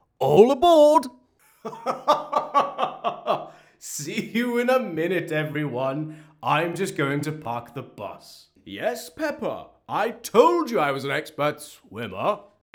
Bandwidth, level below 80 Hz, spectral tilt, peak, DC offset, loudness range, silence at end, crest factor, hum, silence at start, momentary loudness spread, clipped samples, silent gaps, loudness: 20 kHz; -64 dBFS; -5 dB/octave; -2 dBFS; under 0.1%; 7 LU; 0.35 s; 22 dB; none; 0.2 s; 21 LU; under 0.1%; none; -23 LUFS